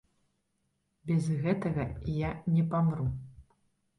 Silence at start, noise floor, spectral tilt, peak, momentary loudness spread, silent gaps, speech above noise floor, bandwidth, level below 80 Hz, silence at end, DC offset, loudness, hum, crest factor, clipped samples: 1.05 s; -78 dBFS; -9 dB/octave; -18 dBFS; 7 LU; none; 48 dB; 11 kHz; -50 dBFS; 0.55 s; under 0.1%; -31 LUFS; none; 14 dB; under 0.1%